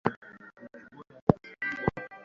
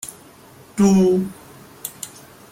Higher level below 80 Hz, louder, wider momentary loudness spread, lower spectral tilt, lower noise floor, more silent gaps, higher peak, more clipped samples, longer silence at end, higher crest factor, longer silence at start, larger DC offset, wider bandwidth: about the same, -54 dBFS vs -56 dBFS; second, -31 LUFS vs -18 LUFS; about the same, 22 LU vs 20 LU; about the same, -7 dB/octave vs -6.5 dB/octave; first, -51 dBFS vs -46 dBFS; first, 0.17-0.22 s, 1.22-1.27 s vs none; about the same, -4 dBFS vs -6 dBFS; neither; second, 0 s vs 0.45 s; first, 30 dB vs 16 dB; about the same, 0.05 s vs 0.05 s; neither; second, 7.2 kHz vs 16 kHz